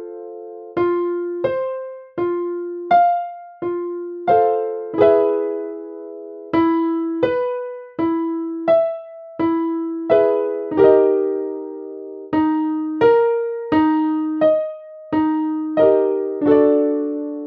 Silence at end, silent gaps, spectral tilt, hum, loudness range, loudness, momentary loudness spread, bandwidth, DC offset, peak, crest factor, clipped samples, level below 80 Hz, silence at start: 0 s; none; -9 dB/octave; none; 3 LU; -19 LUFS; 16 LU; 5 kHz; under 0.1%; 0 dBFS; 18 dB; under 0.1%; -58 dBFS; 0 s